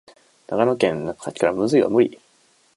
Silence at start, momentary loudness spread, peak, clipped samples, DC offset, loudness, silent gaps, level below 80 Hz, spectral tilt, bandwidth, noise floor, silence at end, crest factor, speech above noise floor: 0.5 s; 11 LU; -4 dBFS; under 0.1%; under 0.1%; -21 LUFS; none; -60 dBFS; -6 dB/octave; 11.5 kHz; -59 dBFS; 0.65 s; 18 dB; 40 dB